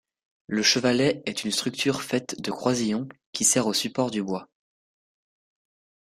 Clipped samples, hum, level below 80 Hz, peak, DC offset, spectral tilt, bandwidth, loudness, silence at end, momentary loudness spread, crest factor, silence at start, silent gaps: under 0.1%; none; -66 dBFS; -6 dBFS; under 0.1%; -3 dB/octave; 15.5 kHz; -25 LUFS; 1.65 s; 11 LU; 20 dB; 0.5 s; 3.26-3.33 s